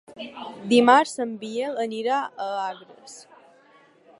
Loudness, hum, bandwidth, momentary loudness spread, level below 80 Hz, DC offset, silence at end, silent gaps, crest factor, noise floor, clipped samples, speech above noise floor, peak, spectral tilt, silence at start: -23 LUFS; none; 11.5 kHz; 25 LU; -76 dBFS; under 0.1%; 1 s; none; 22 dB; -56 dBFS; under 0.1%; 32 dB; -2 dBFS; -4 dB/octave; 0.1 s